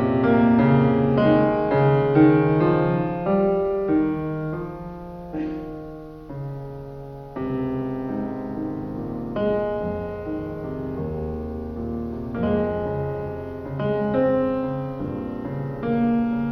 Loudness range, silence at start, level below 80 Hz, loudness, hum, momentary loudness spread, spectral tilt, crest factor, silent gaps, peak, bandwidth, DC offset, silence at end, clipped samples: 12 LU; 0 s; -44 dBFS; -23 LUFS; none; 16 LU; -10.5 dB/octave; 18 dB; none; -4 dBFS; 5.6 kHz; under 0.1%; 0 s; under 0.1%